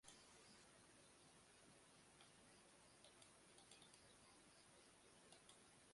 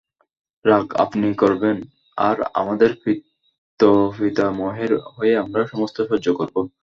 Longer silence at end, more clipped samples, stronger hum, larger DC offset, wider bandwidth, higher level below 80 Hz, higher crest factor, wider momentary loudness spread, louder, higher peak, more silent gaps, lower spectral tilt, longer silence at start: second, 0 s vs 0.15 s; neither; neither; neither; first, 11.5 kHz vs 7.4 kHz; second, -88 dBFS vs -56 dBFS; about the same, 22 dB vs 18 dB; second, 3 LU vs 7 LU; second, -68 LUFS vs -20 LUFS; second, -48 dBFS vs -2 dBFS; second, none vs 3.58-3.77 s; second, -2 dB/octave vs -7.5 dB/octave; second, 0.05 s vs 0.65 s